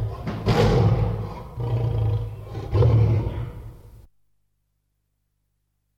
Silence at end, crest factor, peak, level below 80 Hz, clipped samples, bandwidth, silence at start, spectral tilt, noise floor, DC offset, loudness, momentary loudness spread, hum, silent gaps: 2.1 s; 18 dB; -6 dBFS; -34 dBFS; under 0.1%; 7.8 kHz; 0 s; -8 dB/octave; -73 dBFS; 0.1%; -23 LUFS; 16 LU; 50 Hz at -45 dBFS; none